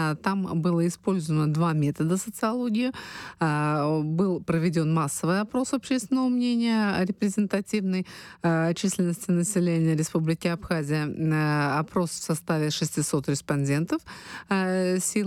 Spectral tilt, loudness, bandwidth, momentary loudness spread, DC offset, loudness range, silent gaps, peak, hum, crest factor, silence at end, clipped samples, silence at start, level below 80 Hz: -5.5 dB/octave; -26 LUFS; 14.5 kHz; 4 LU; under 0.1%; 1 LU; none; -12 dBFS; none; 14 dB; 0 s; under 0.1%; 0 s; -60 dBFS